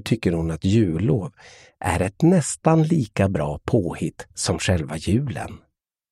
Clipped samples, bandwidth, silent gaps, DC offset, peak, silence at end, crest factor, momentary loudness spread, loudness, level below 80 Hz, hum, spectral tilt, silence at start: under 0.1%; 13 kHz; none; under 0.1%; -2 dBFS; 0.55 s; 20 dB; 11 LU; -22 LUFS; -42 dBFS; none; -6 dB/octave; 0.05 s